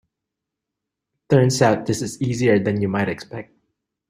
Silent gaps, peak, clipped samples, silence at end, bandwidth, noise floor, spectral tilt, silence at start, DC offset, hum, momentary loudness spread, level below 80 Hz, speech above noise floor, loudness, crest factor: none; -2 dBFS; under 0.1%; 0.65 s; 15.5 kHz; -83 dBFS; -6 dB/octave; 1.3 s; under 0.1%; none; 13 LU; -56 dBFS; 64 dB; -19 LUFS; 20 dB